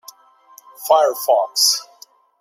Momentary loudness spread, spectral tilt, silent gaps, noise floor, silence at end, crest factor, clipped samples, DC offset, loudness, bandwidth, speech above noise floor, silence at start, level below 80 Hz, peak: 7 LU; 2 dB/octave; none; -49 dBFS; 0.55 s; 18 dB; under 0.1%; under 0.1%; -16 LUFS; 16 kHz; 33 dB; 0.8 s; -80 dBFS; -2 dBFS